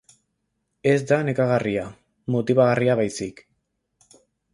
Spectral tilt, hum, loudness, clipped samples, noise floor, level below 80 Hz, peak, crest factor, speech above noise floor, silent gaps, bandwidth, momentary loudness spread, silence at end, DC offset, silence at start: -6.5 dB/octave; none; -22 LUFS; under 0.1%; -75 dBFS; -58 dBFS; -6 dBFS; 18 dB; 55 dB; none; 11.5 kHz; 14 LU; 1.2 s; under 0.1%; 0.85 s